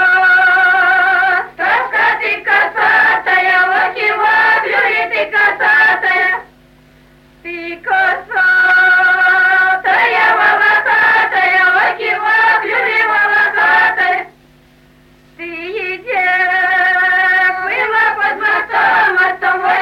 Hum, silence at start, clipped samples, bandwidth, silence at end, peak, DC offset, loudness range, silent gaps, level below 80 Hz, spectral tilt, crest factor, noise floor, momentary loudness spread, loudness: none; 0 s; under 0.1%; 15.5 kHz; 0 s; -2 dBFS; under 0.1%; 4 LU; none; -54 dBFS; -3 dB/octave; 10 dB; -46 dBFS; 7 LU; -11 LUFS